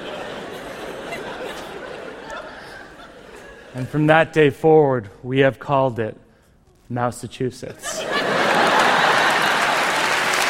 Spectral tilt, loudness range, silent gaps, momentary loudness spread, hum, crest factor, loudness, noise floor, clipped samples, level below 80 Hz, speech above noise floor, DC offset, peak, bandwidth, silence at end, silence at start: -4 dB/octave; 14 LU; none; 20 LU; none; 20 dB; -18 LUFS; -54 dBFS; under 0.1%; -54 dBFS; 35 dB; under 0.1%; 0 dBFS; 16.5 kHz; 0 s; 0 s